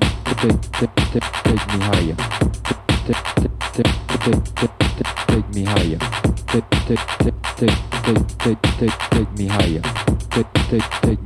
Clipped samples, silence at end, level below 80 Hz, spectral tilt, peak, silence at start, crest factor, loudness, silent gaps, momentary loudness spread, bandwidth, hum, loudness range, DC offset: under 0.1%; 0 s; -28 dBFS; -5.5 dB/octave; -2 dBFS; 0 s; 18 dB; -19 LUFS; none; 2 LU; 13.5 kHz; none; 1 LU; under 0.1%